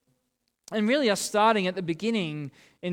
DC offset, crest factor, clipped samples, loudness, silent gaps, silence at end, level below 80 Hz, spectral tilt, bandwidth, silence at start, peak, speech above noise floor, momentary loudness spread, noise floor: under 0.1%; 18 dB; under 0.1%; -26 LUFS; none; 0 s; -72 dBFS; -4.5 dB/octave; 17.5 kHz; 0.7 s; -8 dBFS; 51 dB; 15 LU; -77 dBFS